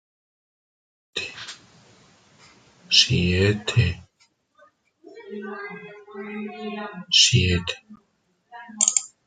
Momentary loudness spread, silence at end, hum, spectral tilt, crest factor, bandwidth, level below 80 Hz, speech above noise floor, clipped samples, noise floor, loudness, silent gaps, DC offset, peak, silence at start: 23 LU; 0.2 s; none; -3 dB/octave; 24 dB; 9.6 kHz; -54 dBFS; 42 dB; under 0.1%; -64 dBFS; -20 LUFS; none; under 0.1%; -2 dBFS; 1.15 s